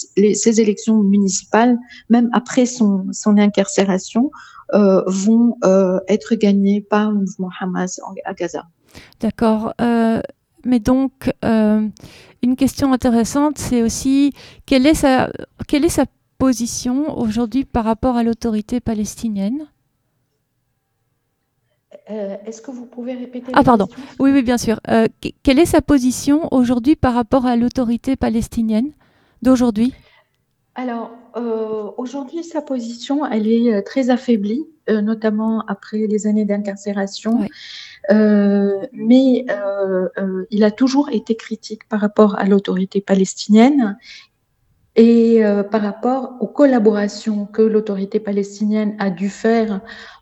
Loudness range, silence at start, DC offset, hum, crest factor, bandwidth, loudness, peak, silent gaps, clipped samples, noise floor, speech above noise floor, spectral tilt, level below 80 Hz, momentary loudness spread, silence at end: 6 LU; 0 s; under 0.1%; none; 16 dB; 14 kHz; -17 LUFS; 0 dBFS; none; under 0.1%; -69 dBFS; 52 dB; -5.5 dB/octave; -42 dBFS; 12 LU; 0.1 s